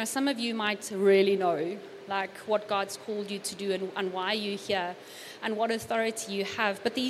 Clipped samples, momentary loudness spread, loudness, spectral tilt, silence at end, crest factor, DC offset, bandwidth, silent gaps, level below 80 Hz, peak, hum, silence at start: under 0.1%; 10 LU; -30 LUFS; -3.5 dB/octave; 0 s; 18 dB; under 0.1%; 14.5 kHz; none; -76 dBFS; -12 dBFS; none; 0 s